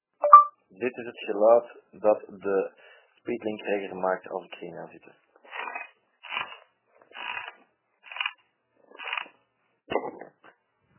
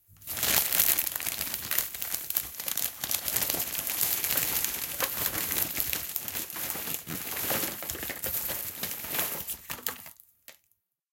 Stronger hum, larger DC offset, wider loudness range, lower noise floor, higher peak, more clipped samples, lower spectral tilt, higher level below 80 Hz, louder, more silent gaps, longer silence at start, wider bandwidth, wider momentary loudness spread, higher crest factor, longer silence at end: neither; neither; first, 11 LU vs 4 LU; about the same, -72 dBFS vs -74 dBFS; about the same, 0 dBFS vs -2 dBFS; neither; about the same, -1.5 dB/octave vs -0.5 dB/octave; second, -74 dBFS vs -58 dBFS; first, -25 LUFS vs -28 LUFS; neither; about the same, 0.2 s vs 0.1 s; second, 3.2 kHz vs 17.5 kHz; first, 21 LU vs 10 LU; about the same, 28 dB vs 30 dB; first, 0.75 s vs 0.6 s